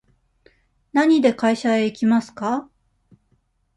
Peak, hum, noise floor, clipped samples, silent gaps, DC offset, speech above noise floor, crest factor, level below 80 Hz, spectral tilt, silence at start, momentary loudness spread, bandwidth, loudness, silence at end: -4 dBFS; none; -65 dBFS; under 0.1%; none; under 0.1%; 47 dB; 18 dB; -64 dBFS; -5.5 dB/octave; 0.95 s; 9 LU; 11.5 kHz; -20 LUFS; 1.15 s